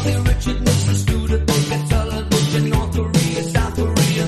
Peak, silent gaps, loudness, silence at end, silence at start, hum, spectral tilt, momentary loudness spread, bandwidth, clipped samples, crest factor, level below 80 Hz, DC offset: -4 dBFS; none; -18 LUFS; 0 s; 0 s; none; -5.5 dB/octave; 3 LU; 13.5 kHz; under 0.1%; 14 dB; -24 dBFS; under 0.1%